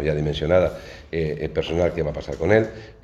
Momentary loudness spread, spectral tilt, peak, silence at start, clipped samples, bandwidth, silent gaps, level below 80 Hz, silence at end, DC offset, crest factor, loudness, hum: 9 LU; -7 dB/octave; -2 dBFS; 0 s; under 0.1%; 8.2 kHz; none; -38 dBFS; 0.1 s; under 0.1%; 22 dB; -23 LUFS; none